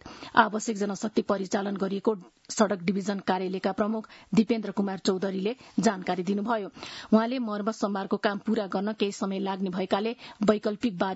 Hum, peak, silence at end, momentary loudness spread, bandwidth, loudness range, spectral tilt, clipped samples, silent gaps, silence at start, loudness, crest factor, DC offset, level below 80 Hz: none; -4 dBFS; 0 s; 6 LU; 8 kHz; 1 LU; -5.5 dB/octave; under 0.1%; none; 0.05 s; -28 LUFS; 24 dB; under 0.1%; -66 dBFS